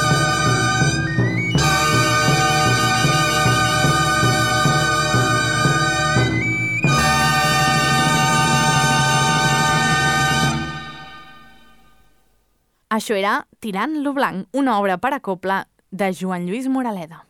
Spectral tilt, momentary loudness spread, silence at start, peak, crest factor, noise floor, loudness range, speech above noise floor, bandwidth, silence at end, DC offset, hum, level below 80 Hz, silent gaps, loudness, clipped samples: -4 dB/octave; 8 LU; 0 s; -4 dBFS; 14 dB; -64 dBFS; 8 LU; 43 dB; 18 kHz; 0.1 s; under 0.1%; none; -42 dBFS; none; -17 LUFS; under 0.1%